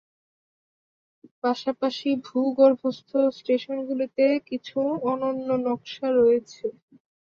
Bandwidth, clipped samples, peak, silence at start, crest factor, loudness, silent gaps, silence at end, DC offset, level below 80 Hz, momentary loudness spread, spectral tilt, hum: 7.2 kHz; under 0.1%; -6 dBFS; 1.45 s; 18 dB; -25 LUFS; none; 0.5 s; under 0.1%; -72 dBFS; 10 LU; -6 dB/octave; none